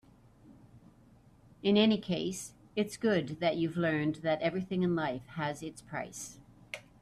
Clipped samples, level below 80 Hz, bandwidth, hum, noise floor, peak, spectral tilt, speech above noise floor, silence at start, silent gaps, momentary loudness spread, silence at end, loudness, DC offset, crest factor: under 0.1%; -66 dBFS; 13.5 kHz; none; -61 dBFS; -14 dBFS; -5.5 dB/octave; 29 dB; 0.45 s; none; 15 LU; 0.2 s; -32 LUFS; under 0.1%; 18 dB